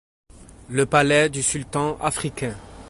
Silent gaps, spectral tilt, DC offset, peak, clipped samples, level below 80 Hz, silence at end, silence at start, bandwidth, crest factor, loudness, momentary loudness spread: none; -4 dB/octave; under 0.1%; -2 dBFS; under 0.1%; -48 dBFS; 0 s; 0.4 s; 12 kHz; 20 dB; -22 LUFS; 11 LU